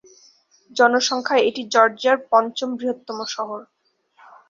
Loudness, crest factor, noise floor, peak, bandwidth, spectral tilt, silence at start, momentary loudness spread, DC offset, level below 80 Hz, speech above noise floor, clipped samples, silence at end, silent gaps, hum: -20 LUFS; 20 dB; -56 dBFS; -2 dBFS; 7.6 kHz; -2 dB/octave; 0.75 s; 12 LU; under 0.1%; -72 dBFS; 36 dB; under 0.1%; 0.85 s; none; none